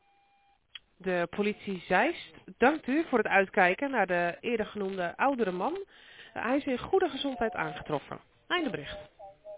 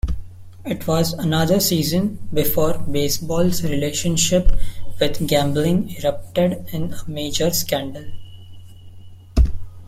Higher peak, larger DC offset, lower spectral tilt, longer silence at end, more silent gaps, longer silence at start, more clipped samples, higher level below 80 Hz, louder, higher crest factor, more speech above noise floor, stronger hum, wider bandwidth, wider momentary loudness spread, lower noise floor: second, -10 dBFS vs -2 dBFS; neither; second, -3 dB/octave vs -4.5 dB/octave; about the same, 0 s vs 0 s; neither; first, 1 s vs 0.05 s; neither; second, -62 dBFS vs -28 dBFS; second, -30 LUFS vs -21 LUFS; first, 22 dB vs 16 dB; first, 38 dB vs 20 dB; neither; second, 4 kHz vs 16.5 kHz; first, 20 LU vs 11 LU; first, -68 dBFS vs -38 dBFS